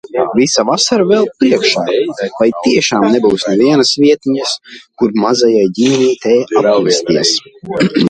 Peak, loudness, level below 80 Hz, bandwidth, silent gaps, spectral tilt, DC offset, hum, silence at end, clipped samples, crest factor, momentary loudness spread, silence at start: 0 dBFS; -12 LUFS; -52 dBFS; 9.8 kHz; none; -4 dB/octave; under 0.1%; none; 0 s; under 0.1%; 12 dB; 6 LU; 0.1 s